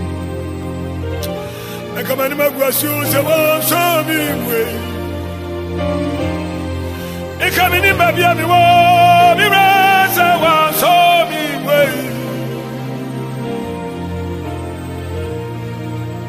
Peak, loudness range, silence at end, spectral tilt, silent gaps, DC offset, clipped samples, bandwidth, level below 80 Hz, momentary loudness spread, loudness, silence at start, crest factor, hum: 0 dBFS; 13 LU; 0 s; -4.5 dB/octave; none; under 0.1%; under 0.1%; 15.5 kHz; -38 dBFS; 15 LU; -14 LUFS; 0 s; 14 dB; none